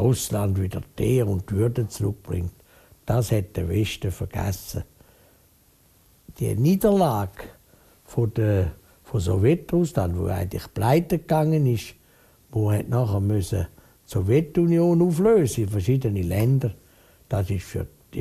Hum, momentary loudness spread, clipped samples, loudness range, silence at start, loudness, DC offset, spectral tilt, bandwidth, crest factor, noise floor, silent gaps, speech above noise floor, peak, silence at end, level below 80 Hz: none; 12 LU; under 0.1%; 6 LU; 0 s; -24 LUFS; under 0.1%; -7.5 dB/octave; 14.5 kHz; 18 dB; -58 dBFS; none; 36 dB; -6 dBFS; 0 s; -44 dBFS